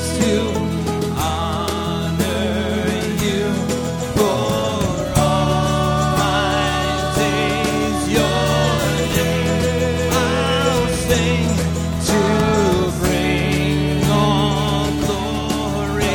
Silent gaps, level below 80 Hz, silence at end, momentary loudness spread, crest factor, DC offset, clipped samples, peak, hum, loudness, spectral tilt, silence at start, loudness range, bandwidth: none; -30 dBFS; 0 s; 5 LU; 16 dB; under 0.1%; under 0.1%; -2 dBFS; none; -18 LUFS; -5 dB/octave; 0 s; 3 LU; 19.5 kHz